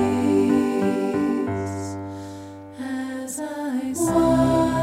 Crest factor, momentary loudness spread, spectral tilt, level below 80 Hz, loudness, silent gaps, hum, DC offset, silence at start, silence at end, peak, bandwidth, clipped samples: 14 dB; 16 LU; -6 dB/octave; -46 dBFS; -23 LUFS; none; none; under 0.1%; 0 s; 0 s; -8 dBFS; 15.5 kHz; under 0.1%